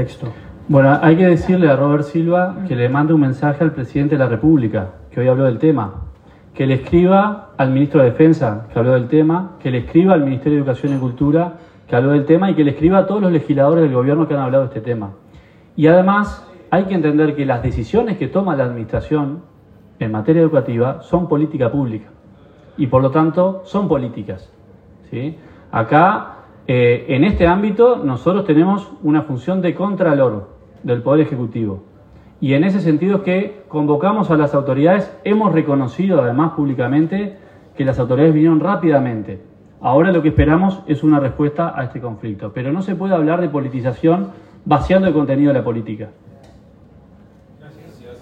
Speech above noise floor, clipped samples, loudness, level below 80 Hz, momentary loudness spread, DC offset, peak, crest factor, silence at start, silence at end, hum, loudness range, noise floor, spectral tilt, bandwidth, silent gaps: 30 dB; under 0.1%; -16 LUFS; -40 dBFS; 12 LU; under 0.1%; 0 dBFS; 16 dB; 0 s; 0.05 s; none; 4 LU; -45 dBFS; -9.5 dB/octave; 7.4 kHz; none